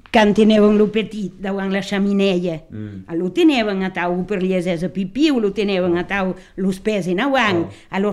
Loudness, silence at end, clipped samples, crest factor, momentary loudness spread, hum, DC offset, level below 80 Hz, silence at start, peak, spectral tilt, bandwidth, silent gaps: -18 LUFS; 0 s; under 0.1%; 16 dB; 12 LU; none; under 0.1%; -46 dBFS; 0.15 s; -2 dBFS; -6.5 dB/octave; 12 kHz; none